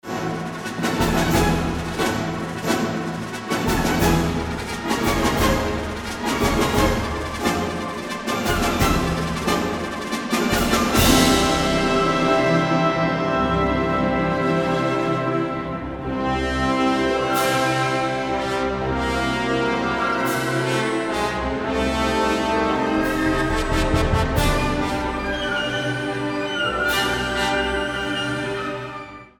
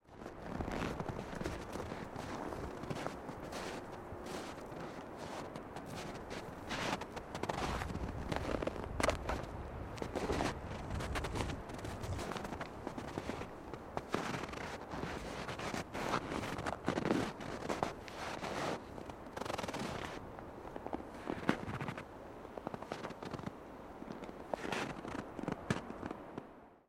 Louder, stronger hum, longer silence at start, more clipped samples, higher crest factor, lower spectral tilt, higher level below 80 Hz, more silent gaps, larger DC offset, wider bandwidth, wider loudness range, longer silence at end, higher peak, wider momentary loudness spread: first, -21 LUFS vs -42 LUFS; neither; about the same, 0.05 s vs 0.05 s; neither; second, 18 dB vs 30 dB; about the same, -4.5 dB/octave vs -5 dB/octave; first, -32 dBFS vs -54 dBFS; neither; neither; first, over 20 kHz vs 16 kHz; about the same, 4 LU vs 5 LU; about the same, 0.15 s vs 0.1 s; first, -2 dBFS vs -12 dBFS; about the same, 8 LU vs 10 LU